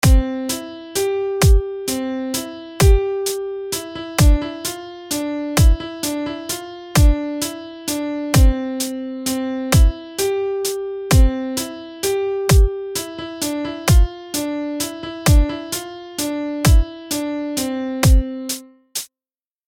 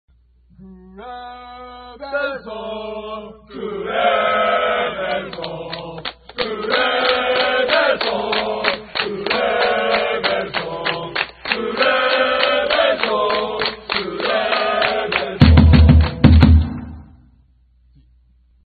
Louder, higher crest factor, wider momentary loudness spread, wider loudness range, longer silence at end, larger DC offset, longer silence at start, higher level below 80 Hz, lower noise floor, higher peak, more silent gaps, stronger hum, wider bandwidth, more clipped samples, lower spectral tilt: second, -20 LUFS vs -17 LUFS; about the same, 16 dB vs 18 dB; second, 11 LU vs 19 LU; second, 1 LU vs 8 LU; second, 0.6 s vs 1.65 s; neither; second, 0.05 s vs 0.6 s; about the same, -20 dBFS vs -24 dBFS; first, under -90 dBFS vs -54 dBFS; about the same, -2 dBFS vs 0 dBFS; neither; neither; first, 17 kHz vs 4.9 kHz; neither; second, -5 dB/octave vs -9 dB/octave